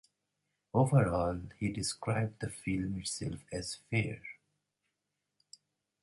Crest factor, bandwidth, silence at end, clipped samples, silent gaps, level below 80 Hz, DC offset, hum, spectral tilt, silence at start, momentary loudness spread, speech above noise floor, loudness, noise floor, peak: 20 dB; 11.5 kHz; 1.7 s; under 0.1%; none; -56 dBFS; under 0.1%; 50 Hz at -60 dBFS; -5.5 dB/octave; 0.75 s; 12 LU; 53 dB; -34 LUFS; -86 dBFS; -14 dBFS